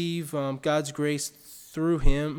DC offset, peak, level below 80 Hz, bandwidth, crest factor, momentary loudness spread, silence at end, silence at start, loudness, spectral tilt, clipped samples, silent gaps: under 0.1%; -8 dBFS; -30 dBFS; 18 kHz; 18 dB; 9 LU; 0 s; 0 s; -28 LUFS; -5.5 dB/octave; under 0.1%; none